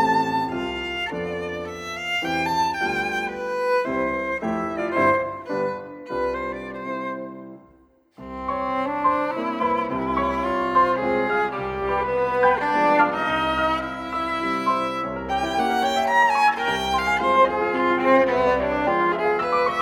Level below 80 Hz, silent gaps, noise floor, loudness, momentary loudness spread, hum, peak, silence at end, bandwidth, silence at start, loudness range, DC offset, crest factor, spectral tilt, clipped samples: -48 dBFS; none; -56 dBFS; -22 LUFS; 11 LU; none; -6 dBFS; 0 s; 16 kHz; 0 s; 7 LU; under 0.1%; 18 dB; -5 dB/octave; under 0.1%